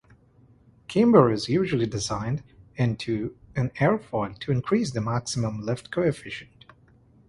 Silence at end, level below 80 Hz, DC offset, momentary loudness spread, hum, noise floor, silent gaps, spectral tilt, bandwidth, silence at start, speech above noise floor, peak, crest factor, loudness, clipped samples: 0.85 s; -54 dBFS; under 0.1%; 13 LU; none; -57 dBFS; none; -6.5 dB/octave; 11.5 kHz; 0.9 s; 33 dB; -2 dBFS; 24 dB; -25 LUFS; under 0.1%